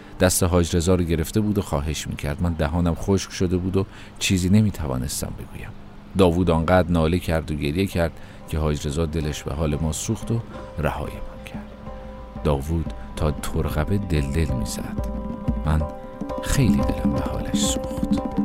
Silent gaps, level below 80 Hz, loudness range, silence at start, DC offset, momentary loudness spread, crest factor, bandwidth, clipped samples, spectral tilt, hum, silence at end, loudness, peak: none; -32 dBFS; 6 LU; 0 s; under 0.1%; 14 LU; 18 dB; 16 kHz; under 0.1%; -5.5 dB/octave; none; 0 s; -23 LUFS; -4 dBFS